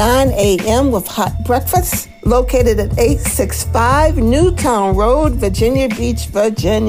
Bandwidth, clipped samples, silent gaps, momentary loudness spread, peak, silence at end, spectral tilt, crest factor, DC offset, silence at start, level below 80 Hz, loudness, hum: 16 kHz; under 0.1%; none; 5 LU; 0 dBFS; 0 s; -5.5 dB/octave; 12 dB; 0.4%; 0 s; -22 dBFS; -14 LUFS; none